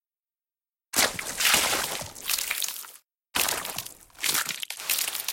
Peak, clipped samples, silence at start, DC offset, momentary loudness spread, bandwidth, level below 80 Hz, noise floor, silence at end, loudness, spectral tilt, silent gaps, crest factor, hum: -6 dBFS; under 0.1%; 0.95 s; under 0.1%; 12 LU; 17 kHz; -60 dBFS; under -90 dBFS; 0 s; -26 LUFS; 0.5 dB/octave; none; 24 dB; none